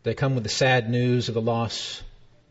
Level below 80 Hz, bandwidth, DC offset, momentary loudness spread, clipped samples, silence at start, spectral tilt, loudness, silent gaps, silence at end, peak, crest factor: -52 dBFS; 8 kHz; under 0.1%; 10 LU; under 0.1%; 0.05 s; -5 dB/octave; -24 LUFS; none; 0.35 s; -8 dBFS; 16 dB